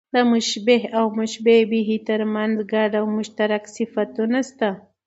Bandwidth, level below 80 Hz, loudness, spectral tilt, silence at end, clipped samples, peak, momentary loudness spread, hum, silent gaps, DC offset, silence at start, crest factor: 8 kHz; -70 dBFS; -21 LUFS; -4.5 dB/octave; 0.3 s; under 0.1%; -4 dBFS; 8 LU; none; none; under 0.1%; 0.15 s; 18 dB